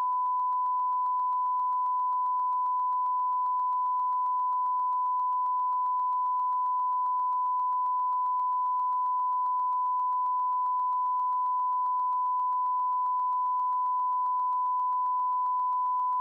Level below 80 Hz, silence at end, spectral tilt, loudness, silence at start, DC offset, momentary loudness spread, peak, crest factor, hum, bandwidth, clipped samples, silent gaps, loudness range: under -90 dBFS; 0 s; -3 dB/octave; -28 LUFS; 0 s; under 0.1%; 0 LU; -24 dBFS; 4 dB; none; 1.7 kHz; under 0.1%; none; 0 LU